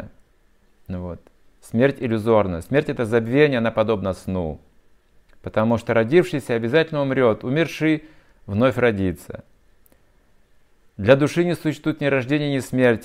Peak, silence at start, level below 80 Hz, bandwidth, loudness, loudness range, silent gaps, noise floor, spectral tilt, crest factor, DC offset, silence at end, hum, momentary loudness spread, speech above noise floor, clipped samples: -2 dBFS; 0 s; -52 dBFS; 16 kHz; -21 LUFS; 3 LU; none; -57 dBFS; -7 dB/octave; 20 dB; under 0.1%; 0 s; none; 15 LU; 37 dB; under 0.1%